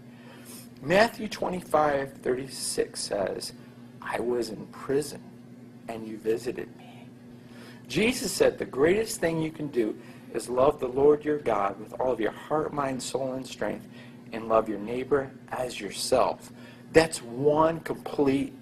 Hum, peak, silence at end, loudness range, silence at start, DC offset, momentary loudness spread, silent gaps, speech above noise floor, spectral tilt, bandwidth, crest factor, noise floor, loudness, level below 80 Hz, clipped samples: none; -4 dBFS; 0 s; 7 LU; 0 s; under 0.1%; 23 LU; none; 20 dB; -4.5 dB/octave; 15 kHz; 24 dB; -47 dBFS; -27 LUFS; -56 dBFS; under 0.1%